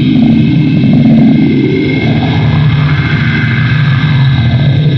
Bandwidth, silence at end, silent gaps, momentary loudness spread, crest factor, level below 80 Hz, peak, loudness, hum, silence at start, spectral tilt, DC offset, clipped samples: 6 kHz; 0 s; none; 4 LU; 8 dB; -32 dBFS; 0 dBFS; -8 LUFS; none; 0 s; -9 dB/octave; under 0.1%; under 0.1%